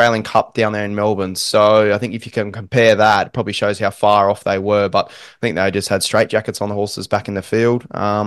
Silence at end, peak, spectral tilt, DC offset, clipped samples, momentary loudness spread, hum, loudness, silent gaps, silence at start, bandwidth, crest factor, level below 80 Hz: 0 s; 0 dBFS; -4.5 dB/octave; under 0.1%; under 0.1%; 10 LU; none; -16 LUFS; none; 0 s; 12.5 kHz; 16 dB; -54 dBFS